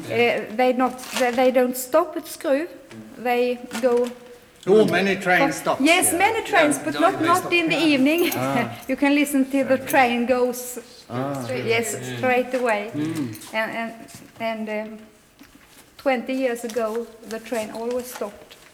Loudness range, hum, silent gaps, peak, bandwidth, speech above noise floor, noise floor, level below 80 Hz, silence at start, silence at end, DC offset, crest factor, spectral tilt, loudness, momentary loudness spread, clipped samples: 9 LU; none; none; -4 dBFS; over 20 kHz; 29 dB; -50 dBFS; -60 dBFS; 0 s; 0.2 s; under 0.1%; 18 dB; -4 dB/octave; -21 LUFS; 13 LU; under 0.1%